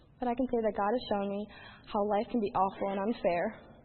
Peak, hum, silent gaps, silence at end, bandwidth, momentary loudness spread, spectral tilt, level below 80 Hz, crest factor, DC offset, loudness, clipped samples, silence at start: -16 dBFS; none; none; 0.1 s; 4.3 kHz; 7 LU; -5 dB/octave; -58 dBFS; 16 dB; under 0.1%; -32 LUFS; under 0.1%; 0.2 s